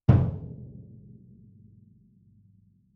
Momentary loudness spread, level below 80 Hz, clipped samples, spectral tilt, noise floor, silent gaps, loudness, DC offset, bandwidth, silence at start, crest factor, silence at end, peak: 28 LU; -44 dBFS; under 0.1%; -11 dB/octave; -61 dBFS; none; -27 LUFS; under 0.1%; 3.8 kHz; 0.1 s; 26 dB; 2.25 s; -4 dBFS